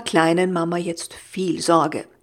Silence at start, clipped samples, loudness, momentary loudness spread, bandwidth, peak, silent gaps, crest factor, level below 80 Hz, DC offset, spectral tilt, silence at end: 0 s; under 0.1%; -21 LUFS; 11 LU; 15 kHz; -2 dBFS; none; 20 dB; -64 dBFS; under 0.1%; -5 dB/octave; 0.2 s